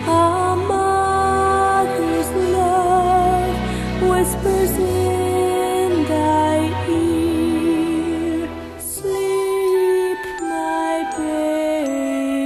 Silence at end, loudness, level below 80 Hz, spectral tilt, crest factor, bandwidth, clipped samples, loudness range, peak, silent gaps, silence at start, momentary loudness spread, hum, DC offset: 0 s; -18 LUFS; -36 dBFS; -5.5 dB/octave; 14 dB; 14 kHz; under 0.1%; 3 LU; -4 dBFS; none; 0 s; 7 LU; none; under 0.1%